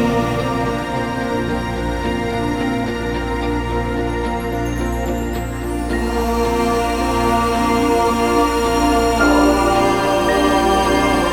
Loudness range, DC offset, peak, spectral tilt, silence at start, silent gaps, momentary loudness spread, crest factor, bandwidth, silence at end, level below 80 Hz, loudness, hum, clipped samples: 6 LU; under 0.1%; -2 dBFS; -5.5 dB/octave; 0 s; none; 7 LU; 16 dB; 19.5 kHz; 0 s; -28 dBFS; -18 LUFS; none; under 0.1%